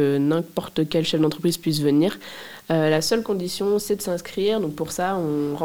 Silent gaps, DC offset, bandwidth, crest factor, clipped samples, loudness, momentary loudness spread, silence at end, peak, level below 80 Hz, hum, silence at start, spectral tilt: none; 0.3%; 18 kHz; 16 dB; under 0.1%; -23 LUFS; 7 LU; 0 s; -6 dBFS; -56 dBFS; none; 0 s; -5.5 dB/octave